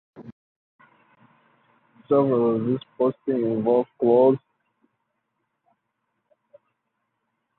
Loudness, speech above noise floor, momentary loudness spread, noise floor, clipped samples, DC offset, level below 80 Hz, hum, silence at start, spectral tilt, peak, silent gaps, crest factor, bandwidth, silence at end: -22 LUFS; 57 dB; 7 LU; -77 dBFS; under 0.1%; under 0.1%; -70 dBFS; none; 0.15 s; -12 dB/octave; -6 dBFS; 0.32-0.79 s; 20 dB; 4.2 kHz; 3.2 s